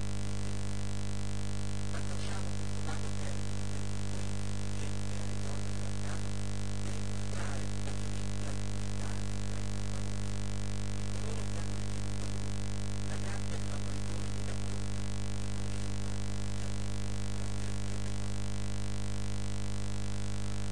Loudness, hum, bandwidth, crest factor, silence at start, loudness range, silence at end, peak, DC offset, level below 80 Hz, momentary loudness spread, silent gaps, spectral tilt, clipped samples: -38 LUFS; 50 Hz at -35 dBFS; 10 kHz; 14 dB; 0 s; 0 LU; 0 s; -22 dBFS; 2%; -42 dBFS; 1 LU; none; -5 dB/octave; under 0.1%